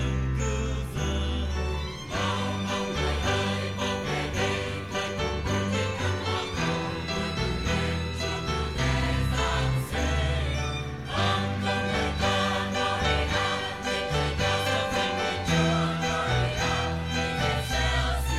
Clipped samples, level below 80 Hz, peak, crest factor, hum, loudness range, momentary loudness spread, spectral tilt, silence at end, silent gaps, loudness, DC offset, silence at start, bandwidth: under 0.1%; -34 dBFS; -12 dBFS; 16 dB; none; 3 LU; 5 LU; -4.5 dB/octave; 0 s; none; -27 LUFS; 0.2%; 0 s; 15 kHz